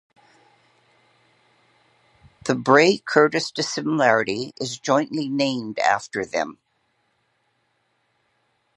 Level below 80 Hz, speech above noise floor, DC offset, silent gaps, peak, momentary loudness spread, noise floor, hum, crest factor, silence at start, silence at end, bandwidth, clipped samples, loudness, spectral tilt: -68 dBFS; 48 dB; under 0.1%; none; 0 dBFS; 12 LU; -69 dBFS; none; 24 dB; 2.45 s; 2.25 s; 11.5 kHz; under 0.1%; -21 LUFS; -4 dB/octave